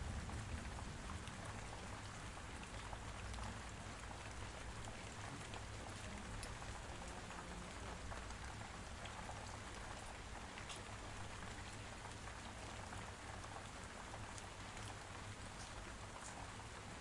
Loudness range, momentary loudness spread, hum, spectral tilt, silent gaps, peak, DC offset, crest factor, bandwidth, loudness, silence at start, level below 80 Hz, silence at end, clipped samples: 1 LU; 2 LU; none; -4 dB/octave; none; -32 dBFS; under 0.1%; 18 dB; 11.5 kHz; -51 LUFS; 0 s; -56 dBFS; 0 s; under 0.1%